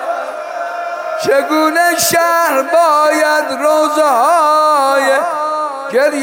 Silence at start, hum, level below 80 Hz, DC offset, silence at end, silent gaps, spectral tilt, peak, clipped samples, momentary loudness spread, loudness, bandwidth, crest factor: 0 s; none; -64 dBFS; under 0.1%; 0 s; none; -2 dB/octave; -2 dBFS; under 0.1%; 11 LU; -12 LUFS; 17 kHz; 10 dB